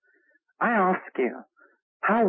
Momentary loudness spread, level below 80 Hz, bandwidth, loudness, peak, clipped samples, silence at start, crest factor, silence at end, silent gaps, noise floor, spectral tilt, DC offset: 7 LU; -78 dBFS; 3.9 kHz; -26 LUFS; -12 dBFS; under 0.1%; 0.6 s; 14 dB; 0 s; 1.82-2.00 s; -66 dBFS; -11 dB/octave; under 0.1%